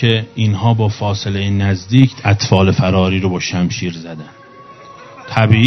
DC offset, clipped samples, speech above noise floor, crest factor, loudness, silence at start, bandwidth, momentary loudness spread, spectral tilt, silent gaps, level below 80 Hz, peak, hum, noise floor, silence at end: under 0.1%; 0.1%; 25 dB; 14 dB; -15 LUFS; 0 s; 6.4 kHz; 11 LU; -6 dB/octave; none; -46 dBFS; 0 dBFS; none; -38 dBFS; 0 s